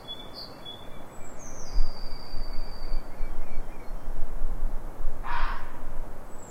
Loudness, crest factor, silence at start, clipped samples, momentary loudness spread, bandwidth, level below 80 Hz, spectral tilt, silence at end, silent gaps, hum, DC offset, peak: -39 LUFS; 14 dB; 0 s; under 0.1%; 9 LU; 6.6 kHz; -28 dBFS; -4.5 dB/octave; 0 s; none; none; under 0.1%; -8 dBFS